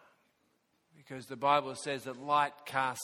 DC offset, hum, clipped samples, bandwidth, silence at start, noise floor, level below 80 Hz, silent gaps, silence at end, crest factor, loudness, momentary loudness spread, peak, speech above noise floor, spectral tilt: under 0.1%; none; under 0.1%; 17.5 kHz; 1.1 s; -75 dBFS; -80 dBFS; none; 0 s; 20 dB; -32 LUFS; 16 LU; -14 dBFS; 42 dB; -3.5 dB/octave